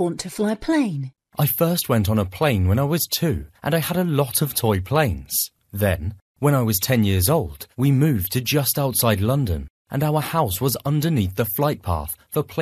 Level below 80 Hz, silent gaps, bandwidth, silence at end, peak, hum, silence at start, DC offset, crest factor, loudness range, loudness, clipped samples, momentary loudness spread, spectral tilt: -42 dBFS; 6.22-6.35 s, 9.70-9.85 s; 14.5 kHz; 0 s; -4 dBFS; none; 0 s; under 0.1%; 18 dB; 2 LU; -21 LUFS; under 0.1%; 7 LU; -5.5 dB/octave